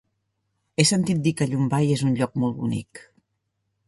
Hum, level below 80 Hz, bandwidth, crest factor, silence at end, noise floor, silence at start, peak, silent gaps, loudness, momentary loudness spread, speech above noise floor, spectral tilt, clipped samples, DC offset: none; -58 dBFS; 11.5 kHz; 22 dB; 0.9 s; -76 dBFS; 0.8 s; -4 dBFS; none; -23 LUFS; 11 LU; 54 dB; -5 dB/octave; under 0.1%; under 0.1%